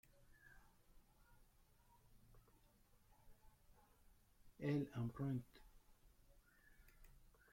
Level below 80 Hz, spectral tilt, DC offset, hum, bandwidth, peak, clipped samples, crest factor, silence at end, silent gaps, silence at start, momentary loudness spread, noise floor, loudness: -70 dBFS; -8 dB/octave; under 0.1%; none; 16.5 kHz; -32 dBFS; under 0.1%; 22 dB; 0.25 s; none; 0.45 s; 6 LU; -73 dBFS; -46 LUFS